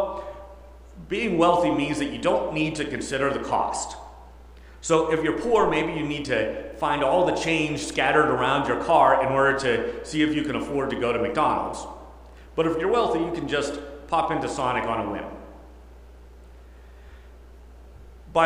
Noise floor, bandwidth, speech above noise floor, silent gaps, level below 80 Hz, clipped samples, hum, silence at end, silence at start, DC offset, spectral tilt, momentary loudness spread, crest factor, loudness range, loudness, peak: -46 dBFS; 15 kHz; 23 dB; none; -46 dBFS; under 0.1%; none; 0 s; 0 s; under 0.1%; -5 dB/octave; 12 LU; 20 dB; 8 LU; -24 LUFS; -6 dBFS